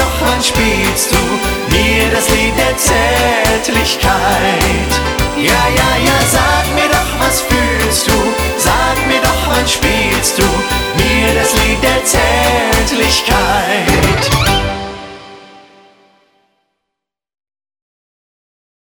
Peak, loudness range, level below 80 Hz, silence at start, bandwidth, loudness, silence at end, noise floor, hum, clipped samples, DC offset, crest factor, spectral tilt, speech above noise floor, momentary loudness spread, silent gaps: 0 dBFS; 3 LU; -22 dBFS; 0 s; over 20 kHz; -11 LUFS; 3.3 s; -78 dBFS; none; under 0.1%; under 0.1%; 12 dB; -3.5 dB/octave; 67 dB; 3 LU; none